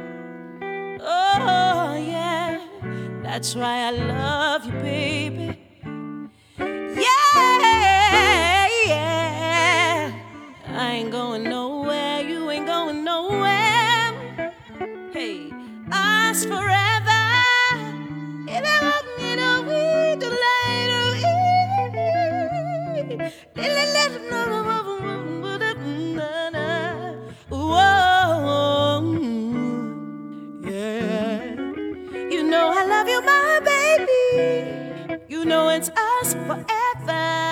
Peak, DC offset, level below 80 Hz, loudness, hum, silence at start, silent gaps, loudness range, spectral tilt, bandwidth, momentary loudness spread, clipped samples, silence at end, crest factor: -4 dBFS; under 0.1%; -50 dBFS; -20 LUFS; none; 0 s; none; 8 LU; -3.5 dB/octave; 19.5 kHz; 16 LU; under 0.1%; 0 s; 18 dB